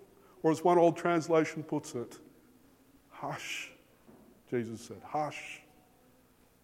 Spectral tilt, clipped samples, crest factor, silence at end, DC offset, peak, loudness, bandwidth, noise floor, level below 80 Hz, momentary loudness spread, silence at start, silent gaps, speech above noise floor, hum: -5.5 dB/octave; under 0.1%; 20 dB; 1.05 s; under 0.1%; -14 dBFS; -32 LUFS; 16 kHz; -65 dBFS; -74 dBFS; 19 LU; 0.45 s; none; 33 dB; none